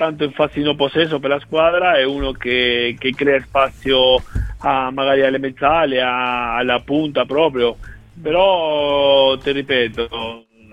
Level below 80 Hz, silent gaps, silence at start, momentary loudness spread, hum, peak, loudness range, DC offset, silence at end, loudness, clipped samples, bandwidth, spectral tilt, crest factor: -36 dBFS; none; 0 s; 7 LU; none; -2 dBFS; 1 LU; 0.1%; 0.35 s; -17 LUFS; under 0.1%; 9 kHz; -6 dB/octave; 16 dB